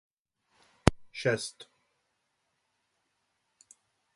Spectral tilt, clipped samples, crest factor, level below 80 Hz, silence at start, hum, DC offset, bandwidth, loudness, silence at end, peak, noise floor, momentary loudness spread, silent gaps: -5 dB/octave; under 0.1%; 36 dB; -48 dBFS; 0.85 s; none; under 0.1%; 11.5 kHz; -31 LUFS; 2.55 s; 0 dBFS; -79 dBFS; 12 LU; none